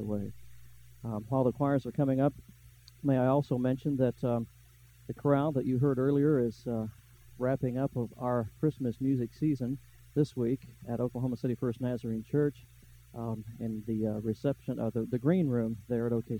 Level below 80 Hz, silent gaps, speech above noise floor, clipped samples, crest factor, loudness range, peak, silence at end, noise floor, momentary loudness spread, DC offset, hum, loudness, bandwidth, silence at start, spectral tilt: -60 dBFS; none; 27 dB; under 0.1%; 16 dB; 4 LU; -14 dBFS; 0 s; -57 dBFS; 10 LU; under 0.1%; none; -32 LUFS; 18 kHz; 0 s; -9.5 dB/octave